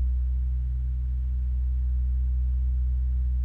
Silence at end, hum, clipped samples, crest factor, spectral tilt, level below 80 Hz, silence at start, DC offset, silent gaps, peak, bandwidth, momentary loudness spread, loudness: 0 s; none; under 0.1%; 6 dB; -10 dB/octave; -26 dBFS; 0 s; under 0.1%; none; -20 dBFS; 0.6 kHz; 2 LU; -29 LUFS